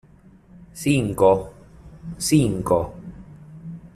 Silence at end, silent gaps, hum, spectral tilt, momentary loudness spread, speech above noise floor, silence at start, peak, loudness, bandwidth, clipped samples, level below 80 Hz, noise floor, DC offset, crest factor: 0.1 s; none; none; -6 dB/octave; 23 LU; 31 dB; 0.75 s; -4 dBFS; -21 LUFS; 14.5 kHz; under 0.1%; -46 dBFS; -50 dBFS; under 0.1%; 20 dB